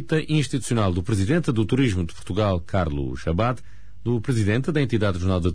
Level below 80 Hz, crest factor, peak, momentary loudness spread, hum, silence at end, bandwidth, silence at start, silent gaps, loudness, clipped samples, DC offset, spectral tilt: -40 dBFS; 14 dB; -10 dBFS; 5 LU; none; 0 s; 11 kHz; 0 s; none; -23 LUFS; under 0.1%; 2%; -6.5 dB/octave